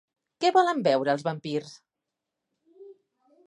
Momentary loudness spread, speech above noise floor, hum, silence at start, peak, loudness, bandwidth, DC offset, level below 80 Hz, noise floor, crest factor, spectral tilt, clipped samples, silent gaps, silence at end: 11 LU; 62 dB; none; 0.4 s; -8 dBFS; -25 LUFS; 11 kHz; under 0.1%; -80 dBFS; -86 dBFS; 20 dB; -5.5 dB/octave; under 0.1%; none; 0.55 s